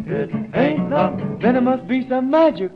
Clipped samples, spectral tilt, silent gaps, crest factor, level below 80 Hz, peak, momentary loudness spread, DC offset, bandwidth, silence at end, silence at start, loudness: under 0.1%; -9 dB/octave; none; 14 dB; -52 dBFS; -4 dBFS; 7 LU; under 0.1%; 5.8 kHz; 0 s; 0 s; -19 LUFS